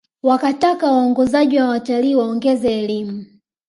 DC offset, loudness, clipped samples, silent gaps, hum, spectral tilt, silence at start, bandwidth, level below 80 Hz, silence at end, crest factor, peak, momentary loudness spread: under 0.1%; -17 LUFS; under 0.1%; none; none; -6 dB/octave; 0.25 s; 11.5 kHz; -56 dBFS; 0.45 s; 14 dB; -2 dBFS; 8 LU